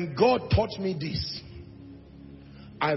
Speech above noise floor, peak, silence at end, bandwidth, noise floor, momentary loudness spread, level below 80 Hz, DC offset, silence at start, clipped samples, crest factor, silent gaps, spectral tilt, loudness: 21 dB; -8 dBFS; 0 s; 6 kHz; -47 dBFS; 24 LU; -46 dBFS; under 0.1%; 0 s; under 0.1%; 20 dB; none; -7 dB/octave; -27 LUFS